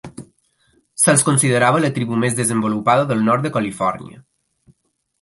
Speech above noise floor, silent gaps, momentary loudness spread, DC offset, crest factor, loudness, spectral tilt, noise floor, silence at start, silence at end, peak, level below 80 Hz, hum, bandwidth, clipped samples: 44 dB; none; 9 LU; under 0.1%; 18 dB; -17 LUFS; -4.5 dB/octave; -61 dBFS; 0.05 s; 1 s; 0 dBFS; -58 dBFS; none; 12 kHz; under 0.1%